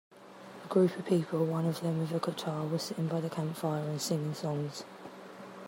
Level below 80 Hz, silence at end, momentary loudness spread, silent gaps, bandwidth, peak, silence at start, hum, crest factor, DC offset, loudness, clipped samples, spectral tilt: -78 dBFS; 0 s; 19 LU; none; 16 kHz; -14 dBFS; 0.1 s; none; 18 dB; under 0.1%; -33 LUFS; under 0.1%; -6.5 dB/octave